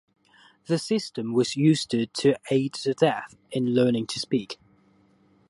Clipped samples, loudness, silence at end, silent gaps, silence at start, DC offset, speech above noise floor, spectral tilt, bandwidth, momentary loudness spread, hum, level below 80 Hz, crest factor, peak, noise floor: under 0.1%; -25 LUFS; 0.95 s; none; 0.7 s; under 0.1%; 37 dB; -5.5 dB/octave; 11.5 kHz; 7 LU; none; -68 dBFS; 20 dB; -6 dBFS; -61 dBFS